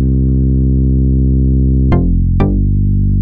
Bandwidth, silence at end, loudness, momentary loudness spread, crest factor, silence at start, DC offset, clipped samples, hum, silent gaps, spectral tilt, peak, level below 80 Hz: 3.5 kHz; 0 s; -13 LUFS; 2 LU; 10 dB; 0 s; under 0.1%; under 0.1%; none; none; -12.5 dB/octave; 0 dBFS; -14 dBFS